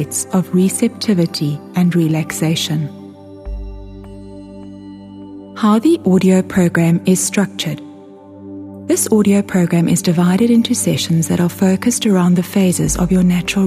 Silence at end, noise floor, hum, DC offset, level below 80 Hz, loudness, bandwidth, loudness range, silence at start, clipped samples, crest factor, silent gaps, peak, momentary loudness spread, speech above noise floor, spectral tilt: 0 s; -37 dBFS; none; under 0.1%; -38 dBFS; -15 LUFS; 15.5 kHz; 7 LU; 0 s; under 0.1%; 14 dB; none; 0 dBFS; 21 LU; 23 dB; -5.5 dB/octave